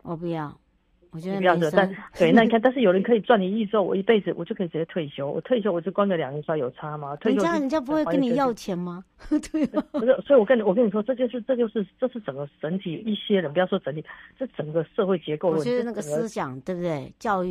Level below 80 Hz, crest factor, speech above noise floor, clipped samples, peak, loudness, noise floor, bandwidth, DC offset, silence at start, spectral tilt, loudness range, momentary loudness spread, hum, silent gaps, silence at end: -58 dBFS; 20 dB; 38 dB; under 0.1%; -4 dBFS; -24 LUFS; -62 dBFS; 13.5 kHz; under 0.1%; 0.05 s; -6.5 dB/octave; 6 LU; 12 LU; none; none; 0 s